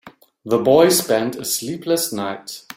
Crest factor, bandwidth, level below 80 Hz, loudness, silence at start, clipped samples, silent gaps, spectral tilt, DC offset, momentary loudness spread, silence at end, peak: 18 dB; 16.5 kHz; -60 dBFS; -18 LUFS; 0.05 s; under 0.1%; none; -3.5 dB/octave; under 0.1%; 13 LU; 0.05 s; -2 dBFS